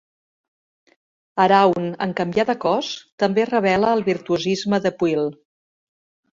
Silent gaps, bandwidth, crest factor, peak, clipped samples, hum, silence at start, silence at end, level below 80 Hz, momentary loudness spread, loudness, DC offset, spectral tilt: 3.12-3.18 s; 7.8 kHz; 18 dB; -2 dBFS; under 0.1%; none; 1.35 s; 1 s; -60 dBFS; 8 LU; -20 LUFS; under 0.1%; -5.5 dB/octave